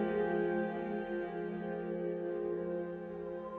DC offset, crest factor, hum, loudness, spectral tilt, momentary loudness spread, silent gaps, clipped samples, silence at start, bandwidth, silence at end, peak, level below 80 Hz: under 0.1%; 14 dB; none; -38 LUFS; -10 dB/octave; 9 LU; none; under 0.1%; 0 s; 4.4 kHz; 0 s; -24 dBFS; -66 dBFS